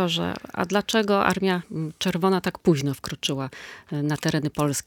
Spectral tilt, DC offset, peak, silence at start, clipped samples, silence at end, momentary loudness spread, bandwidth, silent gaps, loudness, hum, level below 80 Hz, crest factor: -5 dB/octave; under 0.1%; -4 dBFS; 0 s; under 0.1%; 0.05 s; 9 LU; 19 kHz; none; -24 LUFS; none; -56 dBFS; 20 dB